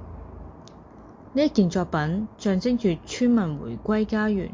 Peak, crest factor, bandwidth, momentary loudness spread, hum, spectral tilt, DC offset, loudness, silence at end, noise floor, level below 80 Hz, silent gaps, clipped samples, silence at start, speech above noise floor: -8 dBFS; 16 dB; 7.6 kHz; 20 LU; none; -6.5 dB/octave; under 0.1%; -24 LUFS; 0 s; -46 dBFS; -46 dBFS; none; under 0.1%; 0 s; 23 dB